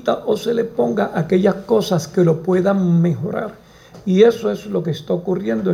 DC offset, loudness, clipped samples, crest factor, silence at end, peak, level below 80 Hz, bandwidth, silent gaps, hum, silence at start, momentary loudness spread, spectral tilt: under 0.1%; -18 LUFS; under 0.1%; 16 dB; 0 s; -2 dBFS; -54 dBFS; 15 kHz; none; none; 0 s; 9 LU; -7.5 dB/octave